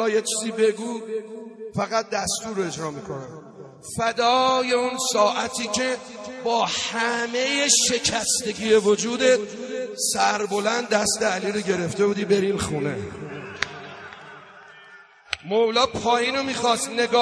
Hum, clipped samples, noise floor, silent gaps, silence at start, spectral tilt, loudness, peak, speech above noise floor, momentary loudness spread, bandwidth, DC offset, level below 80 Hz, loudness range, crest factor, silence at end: none; under 0.1%; -48 dBFS; none; 0 s; -2.5 dB/octave; -22 LUFS; -4 dBFS; 26 dB; 15 LU; 11 kHz; under 0.1%; -56 dBFS; 7 LU; 20 dB; 0 s